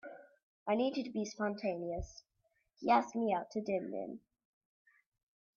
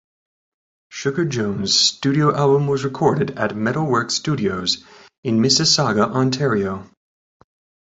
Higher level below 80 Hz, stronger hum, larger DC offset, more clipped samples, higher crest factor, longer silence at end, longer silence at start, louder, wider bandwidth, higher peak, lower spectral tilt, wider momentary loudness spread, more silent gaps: second, -60 dBFS vs -52 dBFS; neither; neither; neither; about the same, 20 dB vs 18 dB; first, 1.4 s vs 1 s; second, 0.05 s vs 0.9 s; second, -36 LUFS vs -18 LUFS; second, 7.2 kHz vs 8 kHz; second, -18 dBFS vs -2 dBFS; about the same, -4.5 dB/octave vs -4 dB/octave; first, 16 LU vs 9 LU; first, 0.43-0.66 s vs 5.18-5.23 s